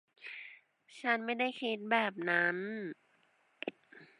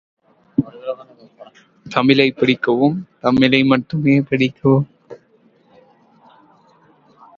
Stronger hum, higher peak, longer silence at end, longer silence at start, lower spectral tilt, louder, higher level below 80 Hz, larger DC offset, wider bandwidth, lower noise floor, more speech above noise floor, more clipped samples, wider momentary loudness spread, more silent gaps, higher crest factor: neither; second, -14 dBFS vs 0 dBFS; second, 0.15 s vs 2.2 s; second, 0.2 s vs 0.6 s; second, -5.5 dB/octave vs -7.5 dB/octave; second, -34 LUFS vs -16 LUFS; second, under -90 dBFS vs -56 dBFS; neither; first, 10.5 kHz vs 7 kHz; first, -72 dBFS vs -55 dBFS; about the same, 38 dB vs 40 dB; neither; about the same, 17 LU vs 15 LU; neither; first, 24 dB vs 18 dB